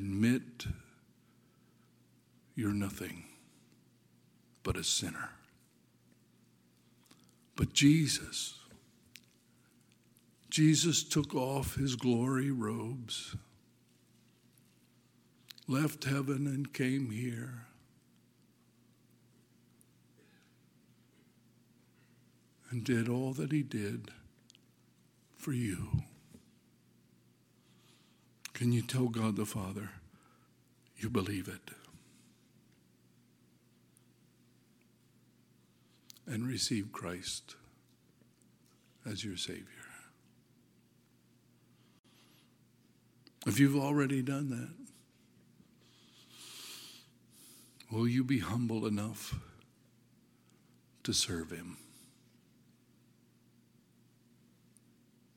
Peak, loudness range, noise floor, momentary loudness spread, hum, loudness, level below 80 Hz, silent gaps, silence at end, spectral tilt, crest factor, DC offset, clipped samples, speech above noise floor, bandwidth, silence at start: -14 dBFS; 12 LU; -68 dBFS; 24 LU; none; -35 LUFS; -62 dBFS; 41.99-42.04 s; 3.55 s; -4.5 dB/octave; 24 dB; under 0.1%; under 0.1%; 34 dB; 17 kHz; 0 s